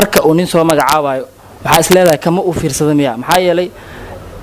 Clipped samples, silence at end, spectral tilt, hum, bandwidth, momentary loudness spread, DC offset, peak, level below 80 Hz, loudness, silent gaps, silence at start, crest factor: 0.2%; 0 s; -4.5 dB/octave; none; 16 kHz; 21 LU; under 0.1%; 0 dBFS; -38 dBFS; -11 LUFS; none; 0 s; 12 dB